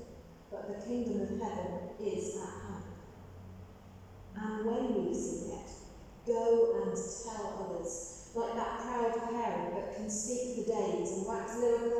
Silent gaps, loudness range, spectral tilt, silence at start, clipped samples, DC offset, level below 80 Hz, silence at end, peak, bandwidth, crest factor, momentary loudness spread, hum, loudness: none; 6 LU; -5 dB/octave; 0 s; under 0.1%; under 0.1%; -58 dBFS; 0 s; -18 dBFS; 12 kHz; 18 dB; 20 LU; none; -36 LUFS